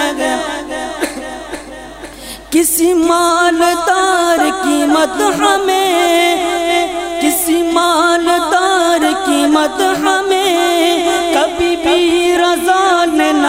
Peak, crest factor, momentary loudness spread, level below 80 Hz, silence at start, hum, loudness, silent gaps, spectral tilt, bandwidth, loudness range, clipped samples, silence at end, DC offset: 0 dBFS; 12 dB; 10 LU; -44 dBFS; 0 s; none; -12 LUFS; none; -2 dB/octave; 16 kHz; 2 LU; under 0.1%; 0 s; under 0.1%